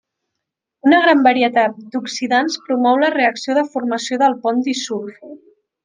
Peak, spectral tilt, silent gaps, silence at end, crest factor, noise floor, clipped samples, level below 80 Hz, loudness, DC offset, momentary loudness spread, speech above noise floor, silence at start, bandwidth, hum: 0 dBFS; -3 dB/octave; none; 0.5 s; 16 dB; -80 dBFS; under 0.1%; -70 dBFS; -16 LUFS; under 0.1%; 11 LU; 64 dB; 0.85 s; 9.8 kHz; none